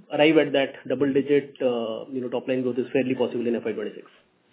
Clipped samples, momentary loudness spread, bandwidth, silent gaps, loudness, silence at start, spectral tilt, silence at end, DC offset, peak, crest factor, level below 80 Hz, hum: under 0.1%; 11 LU; 4 kHz; none; -24 LUFS; 0.1 s; -10 dB/octave; 0.5 s; under 0.1%; -6 dBFS; 20 dB; -74 dBFS; none